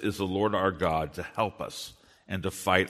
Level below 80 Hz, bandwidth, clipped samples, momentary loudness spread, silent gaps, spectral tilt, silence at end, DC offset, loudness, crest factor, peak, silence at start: -54 dBFS; 13.5 kHz; under 0.1%; 11 LU; none; -5 dB/octave; 0 s; under 0.1%; -30 LUFS; 24 dB; -6 dBFS; 0 s